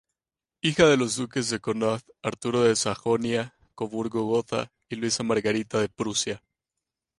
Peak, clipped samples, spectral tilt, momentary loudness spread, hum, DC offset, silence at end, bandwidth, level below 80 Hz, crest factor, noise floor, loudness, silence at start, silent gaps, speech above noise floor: -6 dBFS; under 0.1%; -4 dB/octave; 11 LU; none; under 0.1%; 0.8 s; 11.5 kHz; -60 dBFS; 20 dB; under -90 dBFS; -26 LUFS; 0.65 s; none; over 65 dB